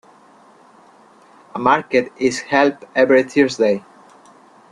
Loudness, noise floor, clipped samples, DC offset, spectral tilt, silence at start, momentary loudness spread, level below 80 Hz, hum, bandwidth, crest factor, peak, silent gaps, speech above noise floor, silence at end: -17 LUFS; -48 dBFS; under 0.1%; under 0.1%; -4.5 dB/octave; 1.55 s; 7 LU; -60 dBFS; none; 11 kHz; 18 dB; -2 dBFS; none; 32 dB; 0.9 s